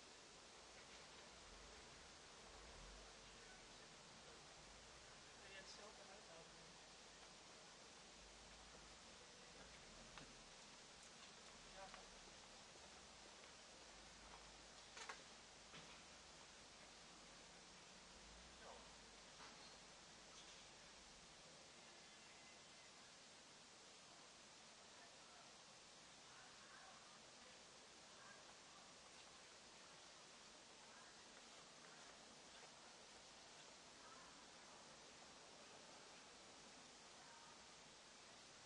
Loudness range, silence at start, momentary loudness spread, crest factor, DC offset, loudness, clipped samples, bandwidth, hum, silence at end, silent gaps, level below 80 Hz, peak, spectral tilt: 2 LU; 0 s; 3 LU; 24 dB; under 0.1%; -61 LUFS; under 0.1%; 11 kHz; none; 0 s; none; -78 dBFS; -40 dBFS; -1.5 dB/octave